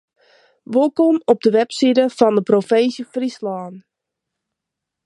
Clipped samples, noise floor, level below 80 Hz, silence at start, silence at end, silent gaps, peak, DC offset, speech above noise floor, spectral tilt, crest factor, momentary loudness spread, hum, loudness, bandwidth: under 0.1%; -82 dBFS; -70 dBFS; 0.7 s; 1.25 s; none; 0 dBFS; under 0.1%; 66 dB; -6 dB/octave; 18 dB; 11 LU; none; -17 LUFS; 11.5 kHz